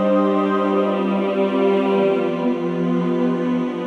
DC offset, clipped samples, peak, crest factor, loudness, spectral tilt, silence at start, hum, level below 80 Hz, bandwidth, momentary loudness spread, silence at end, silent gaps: under 0.1%; under 0.1%; -6 dBFS; 12 dB; -19 LUFS; -8.5 dB/octave; 0 s; none; -66 dBFS; 7.4 kHz; 4 LU; 0 s; none